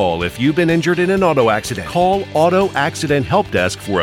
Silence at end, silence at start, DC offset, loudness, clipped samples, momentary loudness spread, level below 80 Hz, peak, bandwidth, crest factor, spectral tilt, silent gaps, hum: 0 s; 0 s; under 0.1%; -16 LUFS; under 0.1%; 4 LU; -42 dBFS; -2 dBFS; 16.5 kHz; 12 dB; -5.5 dB/octave; none; none